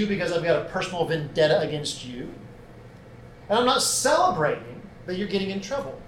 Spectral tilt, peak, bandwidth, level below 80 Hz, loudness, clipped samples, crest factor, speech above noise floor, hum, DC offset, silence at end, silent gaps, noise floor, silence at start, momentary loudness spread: -3.5 dB/octave; -8 dBFS; 16.5 kHz; -52 dBFS; -24 LUFS; under 0.1%; 18 dB; 21 dB; none; under 0.1%; 0 s; none; -45 dBFS; 0 s; 16 LU